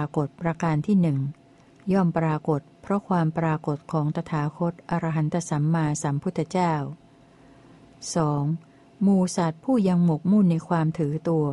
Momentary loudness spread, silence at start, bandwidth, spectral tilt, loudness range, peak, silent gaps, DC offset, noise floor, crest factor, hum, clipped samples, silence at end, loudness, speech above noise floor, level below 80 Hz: 8 LU; 0 s; 11.5 kHz; -7.5 dB/octave; 4 LU; -10 dBFS; none; under 0.1%; -53 dBFS; 14 dB; none; under 0.1%; 0 s; -25 LUFS; 29 dB; -58 dBFS